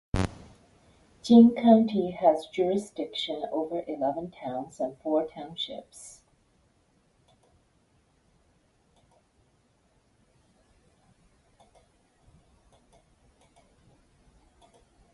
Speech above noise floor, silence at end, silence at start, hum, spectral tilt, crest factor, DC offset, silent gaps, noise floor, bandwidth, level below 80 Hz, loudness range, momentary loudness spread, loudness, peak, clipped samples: 42 dB; 9.05 s; 0.15 s; none; -6.5 dB/octave; 24 dB; under 0.1%; none; -67 dBFS; 11.5 kHz; -54 dBFS; 15 LU; 18 LU; -26 LUFS; -6 dBFS; under 0.1%